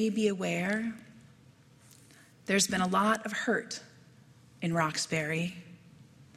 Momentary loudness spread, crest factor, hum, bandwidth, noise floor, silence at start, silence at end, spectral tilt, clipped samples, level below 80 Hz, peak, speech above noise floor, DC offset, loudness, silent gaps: 15 LU; 20 dB; none; 15 kHz; -59 dBFS; 0 s; 0.15 s; -4 dB/octave; under 0.1%; -70 dBFS; -14 dBFS; 29 dB; under 0.1%; -30 LUFS; none